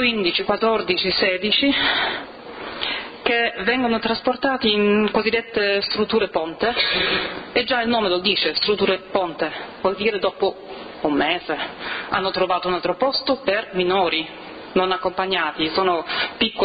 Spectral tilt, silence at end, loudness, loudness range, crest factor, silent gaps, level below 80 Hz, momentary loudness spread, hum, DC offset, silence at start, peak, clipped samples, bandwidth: -8 dB/octave; 0 s; -20 LUFS; 3 LU; 16 dB; none; -52 dBFS; 7 LU; none; under 0.1%; 0 s; -4 dBFS; under 0.1%; 5.2 kHz